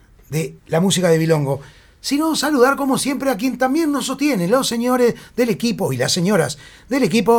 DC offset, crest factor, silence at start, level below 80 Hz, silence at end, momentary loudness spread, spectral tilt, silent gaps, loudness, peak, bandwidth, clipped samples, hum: under 0.1%; 16 dB; 0.3 s; -52 dBFS; 0 s; 9 LU; -5 dB/octave; none; -18 LUFS; -2 dBFS; 19.5 kHz; under 0.1%; none